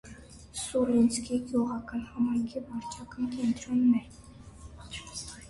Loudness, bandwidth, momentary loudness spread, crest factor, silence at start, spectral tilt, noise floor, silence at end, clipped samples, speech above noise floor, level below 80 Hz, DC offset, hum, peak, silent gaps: -30 LUFS; 11.5 kHz; 24 LU; 16 dB; 0.05 s; -5 dB/octave; -49 dBFS; 0 s; under 0.1%; 20 dB; -54 dBFS; under 0.1%; none; -14 dBFS; none